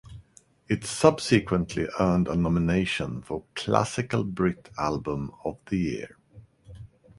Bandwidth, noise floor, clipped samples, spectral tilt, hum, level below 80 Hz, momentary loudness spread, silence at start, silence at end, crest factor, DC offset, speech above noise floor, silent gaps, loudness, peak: 11.5 kHz; -58 dBFS; under 0.1%; -6 dB/octave; none; -46 dBFS; 11 LU; 0.05 s; 0.35 s; 24 dB; under 0.1%; 32 dB; none; -27 LUFS; -2 dBFS